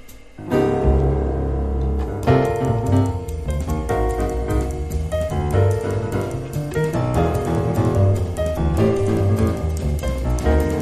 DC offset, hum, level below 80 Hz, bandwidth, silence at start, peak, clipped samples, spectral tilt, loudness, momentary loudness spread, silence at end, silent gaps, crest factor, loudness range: under 0.1%; none; -26 dBFS; 13.5 kHz; 0 s; -4 dBFS; under 0.1%; -7.5 dB/octave; -21 LUFS; 6 LU; 0 s; none; 16 dB; 2 LU